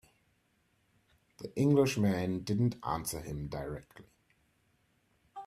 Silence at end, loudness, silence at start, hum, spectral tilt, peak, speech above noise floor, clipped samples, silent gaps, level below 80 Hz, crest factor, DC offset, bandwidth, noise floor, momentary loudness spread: 0 s; -32 LUFS; 1.4 s; none; -6.5 dB/octave; -14 dBFS; 42 dB; under 0.1%; none; -58 dBFS; 20 dB; under 0.1%; 15.5 kHz; -74 dBFS; 17 LU